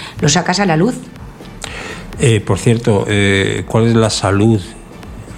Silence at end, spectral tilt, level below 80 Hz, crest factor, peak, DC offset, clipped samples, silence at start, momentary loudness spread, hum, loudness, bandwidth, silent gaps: 0 s; -5 dB/octave; -36 dBFS; 14 dB; 0 dBFS; under 0.1%; under 0.1%; 0 s; 20 LU; none; -13 LUFS; 13.5 kHz; none